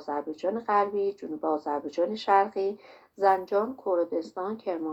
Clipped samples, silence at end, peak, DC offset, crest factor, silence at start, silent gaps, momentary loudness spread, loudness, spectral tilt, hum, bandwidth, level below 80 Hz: under 0.1%; 0 s; -8 dBFS; under 0.1%; 20 dB; 0 s; none; 9 LU; -28 LUFS; -6 dB/octave; none; 8 kHz; -74 dBFS